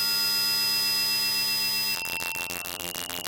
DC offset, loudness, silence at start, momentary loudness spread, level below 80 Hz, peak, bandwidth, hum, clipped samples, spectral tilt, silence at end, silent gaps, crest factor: under 0.1%; -24 LUFS; 0 s; 9 LU; -62 dBFS; -8 dBFS; 17 kHz; none; under 0.1%; 0.5 dB/octave; 0 s; none; 20 dB